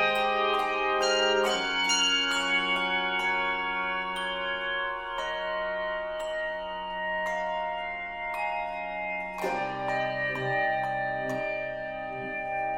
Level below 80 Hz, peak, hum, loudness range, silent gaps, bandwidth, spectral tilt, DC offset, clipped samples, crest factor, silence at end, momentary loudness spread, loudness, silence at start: -56 dBFS; -12 dBFS; none; 7 LU; none; 16 kHz; -2 dB/octave; under 0.1%; under 0.1%; 16 dB; 0 s; 9 LU; -28 LUFS; 0 s